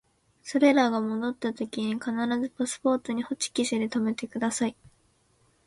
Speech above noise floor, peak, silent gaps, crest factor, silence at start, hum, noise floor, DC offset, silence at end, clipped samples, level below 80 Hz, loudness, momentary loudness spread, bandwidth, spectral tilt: 39 dB; -8 dBFS; none; 20 dB; 0.45 s; none; -66 dBFS; under 0.1%; 0.95 s; under 0.1%; -68 dBFS; -27 LUFS; 9 LU; 11.5 kHz; -4 dB/octave